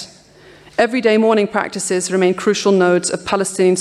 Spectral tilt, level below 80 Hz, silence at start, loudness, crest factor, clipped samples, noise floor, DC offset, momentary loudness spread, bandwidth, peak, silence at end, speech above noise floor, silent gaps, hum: -4.5 dB/octave; -58 dBFS; 0 s; -16 LUFS; 14 dB; under 0.1%; -44 dBFS; under 0.1%; 6 LU; 13 kHz; -2 dBFS; 0 s; 29 dB; none; none